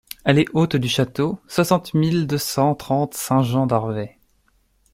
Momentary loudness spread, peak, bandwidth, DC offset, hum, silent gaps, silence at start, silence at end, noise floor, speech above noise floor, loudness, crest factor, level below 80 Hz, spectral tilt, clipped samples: 4 LU; -2 dBFS; 16.5 kHz; under 0.1%; none; none; 0.25 s; 0.85 s; -62 dBFS; 43 dB; -20 LUFS; 18 dB; -52 dBFS; -6 dB/octave; under 0.1%